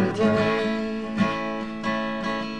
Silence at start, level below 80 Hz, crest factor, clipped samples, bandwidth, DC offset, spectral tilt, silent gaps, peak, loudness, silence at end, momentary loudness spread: 0 s; -54 dBFS; 16 dB; under 0.1%; 9.8 kHz; 0.4%; -6.5 dB/octave; none; -10 dBFS; -25 LUFS; 0 s; 7 LU